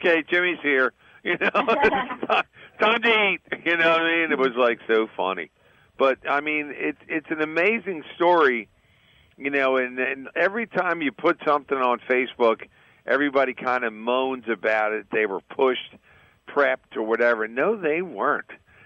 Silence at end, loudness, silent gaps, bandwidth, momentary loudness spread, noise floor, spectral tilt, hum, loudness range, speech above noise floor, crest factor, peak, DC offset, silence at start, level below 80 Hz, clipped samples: 0.3 s; -23 LUFS; none; 7.8 kHz; 8 LU; -58 dBFS; -5.5 dB/octave; none; 4 LU; 35 dB; 16 dB; -6 dBFS; under 0.1%; 0 s; -64 dBFS; under 0.1%